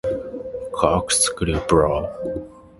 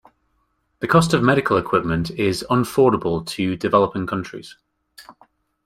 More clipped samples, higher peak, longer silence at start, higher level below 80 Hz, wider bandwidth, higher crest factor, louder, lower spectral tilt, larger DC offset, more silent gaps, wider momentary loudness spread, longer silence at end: neither; about the same, 0 dBFS vs -2 dBFS; second, 0.05 s vs 0.8 s; first, -36 dBFS vs -48 dBFS; second, 12 kHz vs 16 kHz; about the same, 22 dB vs 20 dB; about the same, -20 LUFS vs -19 LUFS; second, -4 dB/octave vs -6 dB/octave; neither; neither; first, 13 LU vs 10 LU; second, 0.15 s vs 0.55 s